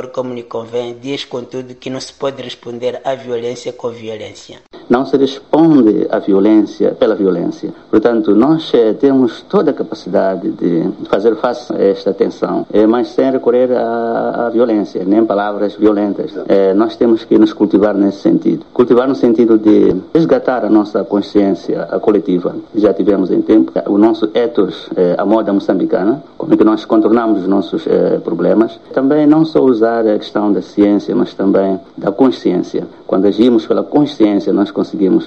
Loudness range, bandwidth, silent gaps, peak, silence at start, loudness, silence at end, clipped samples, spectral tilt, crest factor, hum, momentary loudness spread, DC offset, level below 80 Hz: 3 LU; 8 kHz; none; 0 dBFS; 0 s; -13 LUFS; 0 s; under 0.1%; -7.5 dB/octave; 12 dB; none; 11 LU; 0.3%; -54 dBFS